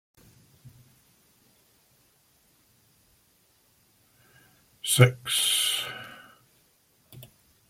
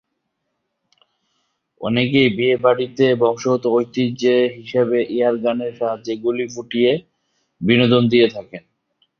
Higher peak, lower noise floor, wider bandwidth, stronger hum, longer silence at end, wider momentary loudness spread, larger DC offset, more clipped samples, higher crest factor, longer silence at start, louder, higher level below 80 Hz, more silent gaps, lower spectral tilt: about the same, -4 dBFS vs -2 dBFS; second, -65 dBFS vs -74 dBFS; first, 16.5 kHz vs 6.8 kHz; neither; about the same, 0.5 s vs 0.6 s; first, 29 LU vs 10 LU; neither; neither; first, 28 dB vs 18 dB; second, 0.65 s vs 1.8 s; second, -23 LUFS vs -18 LUFS; second, -64 dBFS vs -58 dBFS; neither; second, -3 dB/octave vs -6.5 dB/octave